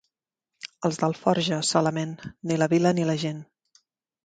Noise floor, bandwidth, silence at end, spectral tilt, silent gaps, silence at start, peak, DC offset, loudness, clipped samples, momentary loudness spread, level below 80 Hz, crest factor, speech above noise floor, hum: -85 dBFS; 9.4 kHz; 0.8 s; -5 dB/octave; none; 0.65 s; -6 dBFS; under 0.1%; -25 LUFS; under 0.1%; 14 LU; -66 dBFS; 20 dB; 61 dB; none